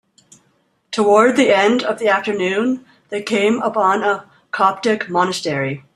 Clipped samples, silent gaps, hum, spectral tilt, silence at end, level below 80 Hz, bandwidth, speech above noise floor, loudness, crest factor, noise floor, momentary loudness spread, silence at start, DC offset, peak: under 0.1%; none; none; -4.5 dB/octave; 0.15 s; -64 dBFS; 12.5 kHz; 46 dB; -17 LUFS; 16 dB; -62 dBFS; 13 LU; 0.9 s; under 0.1%; -2 dBFS